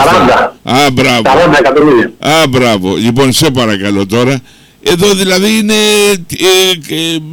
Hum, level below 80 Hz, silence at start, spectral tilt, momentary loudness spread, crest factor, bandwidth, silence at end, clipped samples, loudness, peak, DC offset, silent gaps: none; -36 dBFS; 0 s; -4 dB/octave; 6 LU; 8 dB; 19.5 kHz; 0 s; under 0.1%; -8 LUFS; 0 dBFS; under 0.1%; none